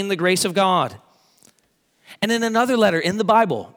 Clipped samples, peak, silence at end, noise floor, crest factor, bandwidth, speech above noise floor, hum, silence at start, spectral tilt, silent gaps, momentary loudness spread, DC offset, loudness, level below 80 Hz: under 0.1%; -2 dBFS; 0.1 s; -64 dBFS; 18 dB; over 20 kHz; 45 dB; none; 0 s; -4 dB/octave; none; 5 LU; under 0.1%; -19 LUFS; -68 dBFS